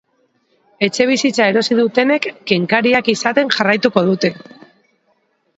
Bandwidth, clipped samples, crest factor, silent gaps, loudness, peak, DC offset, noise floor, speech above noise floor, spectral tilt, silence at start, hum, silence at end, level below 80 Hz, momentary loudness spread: 8.2 kHz; under 0.1%; 16 dB; none; -15 LUFS; 0 dBFS; under 0.1%; -62 dBFS; 47 dB; -4.5 dB/octave; 0.8 s; none; 1.2 s; -60 dBFS; 5 LU